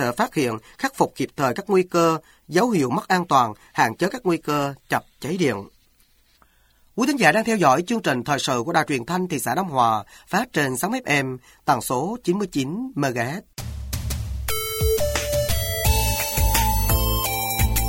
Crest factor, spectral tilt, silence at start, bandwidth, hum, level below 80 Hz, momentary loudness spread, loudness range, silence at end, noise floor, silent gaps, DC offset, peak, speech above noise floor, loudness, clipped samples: 20 dB; -4.5 dB/octave; 0 s; 17 kHz; none; -32 dBFS; 9 LU; 4 LU; 0 s; -59 dBFS; none; under 0.1%; -2 dBFS; 37 dB; -22 LUFS; under 0.1%